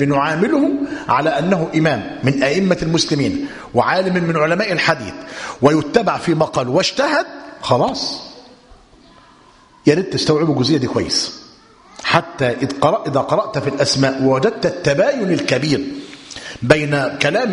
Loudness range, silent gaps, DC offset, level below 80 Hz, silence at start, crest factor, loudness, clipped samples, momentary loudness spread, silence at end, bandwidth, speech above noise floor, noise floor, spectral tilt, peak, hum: 3 LU; none; under 0.1%; -48 dBFS; 0 s; 18 dB; -17 LUFS; under 0.1%; 10 LU; 0 s; 11 kHz; 31 dB; -48 dBFS; -5 dB/octave; 0 dBFS; none